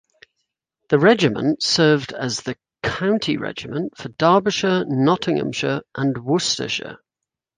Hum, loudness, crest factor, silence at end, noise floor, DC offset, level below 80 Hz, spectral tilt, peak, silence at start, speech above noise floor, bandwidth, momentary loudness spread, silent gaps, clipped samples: none; -20 LUFS; 18 dB; 0.6 s; -85 dBFS; under 0.1%; -56 dBFS; -4.5 dB/octave; -2 dBFS; 0.9 s; 66 dB; 9.8 kHz; 11 LU; none; under 0.1%